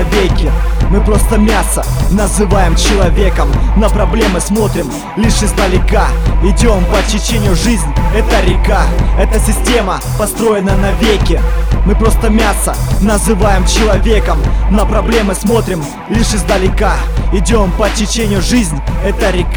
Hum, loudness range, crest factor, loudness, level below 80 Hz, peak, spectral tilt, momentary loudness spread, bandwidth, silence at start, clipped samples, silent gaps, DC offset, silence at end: none; 1 LU; 10 dB; -12 LUFS; -12 dBFS; 0 dBFS; -5 dB/octave; 4 LU; 18 kHz; 0 s; 0.2%; none; under 0.1%; 0 s